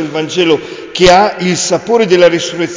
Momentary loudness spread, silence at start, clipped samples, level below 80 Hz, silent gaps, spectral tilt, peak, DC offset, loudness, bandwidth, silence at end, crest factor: 8 LU; 0 s; under 0.1%; -38 dBFS; none; -4 dB/octave; 0 dBFS; under 0.1%; -10 LUFS; 8 kHz; 0 s; 10 dB